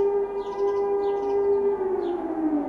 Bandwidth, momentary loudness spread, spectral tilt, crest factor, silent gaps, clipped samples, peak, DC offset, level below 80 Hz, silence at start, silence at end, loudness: 6.2 kHz; 4 LU; -7.5 dB/octave; 10 dB; none; under 0.1%; -14 dBFS; under 0.1%; -56 dBFS; 0 s; 0 s; -25 LUFS